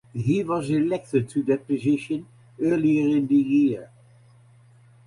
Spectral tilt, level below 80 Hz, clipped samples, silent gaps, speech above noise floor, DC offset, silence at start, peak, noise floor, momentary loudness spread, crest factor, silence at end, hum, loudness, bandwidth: -8 dB/octave; -60 dBFS; under 0.1%; none; 31 dB; under 0.1%; 0.15 s; -10 dBFS; -53 dBFS; 6 LU; 14 dB; 1.2 s; none; -23 LUFS; 11 kHz